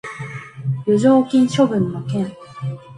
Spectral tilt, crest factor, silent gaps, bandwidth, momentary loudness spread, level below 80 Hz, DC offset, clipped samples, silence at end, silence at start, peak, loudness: -7 dB/octave; 16 dB; none; 11 kHz; 16 LU; -56 dBFS; under 0.1%; under 0.1%; 0 s; 0.05 s; -2 dBFS; -18 LUFS